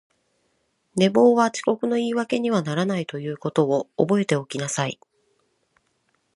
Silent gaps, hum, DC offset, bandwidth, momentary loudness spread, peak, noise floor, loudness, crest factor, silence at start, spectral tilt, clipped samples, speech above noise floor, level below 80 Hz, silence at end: none; none; under 0.1%; 11.5 kHz; 12 LU; -4 dBFS; -70 dBFS; -22 LUFS; 20 dB; 0.95 s; -5.5 dB/octave; under 0.1%; 48 dB; -68 dBFS; 1.4 s